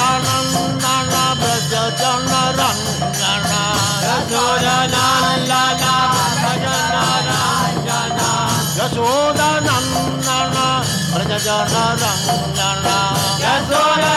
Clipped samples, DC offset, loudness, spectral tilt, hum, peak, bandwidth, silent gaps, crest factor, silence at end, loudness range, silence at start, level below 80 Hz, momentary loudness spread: under 0.1%; under 0.1%; -16 LUFS; -3 dB/octave; none; -4 dBFS; 17 kHz; none; 14 dB; 0 s; 2 LU; 0 s; -42 dBFS; 3 LU